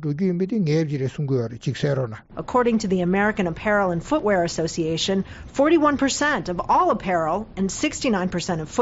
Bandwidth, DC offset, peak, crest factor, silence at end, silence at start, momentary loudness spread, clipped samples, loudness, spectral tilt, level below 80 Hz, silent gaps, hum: 8 kHz; under 0.1%; -8 dBFS; 14 dB; 0 s; 0 s; 7 LU; under 0.1%; -22 LUFS; -5 dB/octave; -46 dBFS; none; none